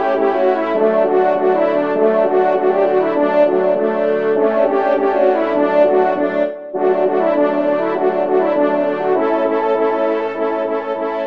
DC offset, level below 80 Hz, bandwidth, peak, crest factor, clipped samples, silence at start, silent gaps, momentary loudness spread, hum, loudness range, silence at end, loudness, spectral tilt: 0.5%; -68 dBFS; 5.6 kHz; -2 dBFS; 14 dB; under 0.1%; 0 s; none; 5 LU; none; 2 LU; 0 s; -16 LUFS; -8 dB/octave